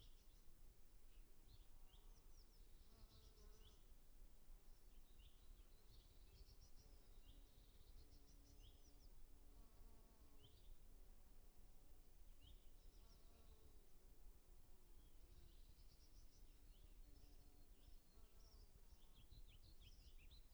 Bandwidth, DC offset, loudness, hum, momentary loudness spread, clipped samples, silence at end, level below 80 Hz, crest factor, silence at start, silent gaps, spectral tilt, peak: over 20 kHz; under 0.1%; -69 LUFS; none; 2 LU; under 0.1%; 0 s; -66 dBFS; 12 dB; 0 s; none; -4 dB/octave; -50 dBFS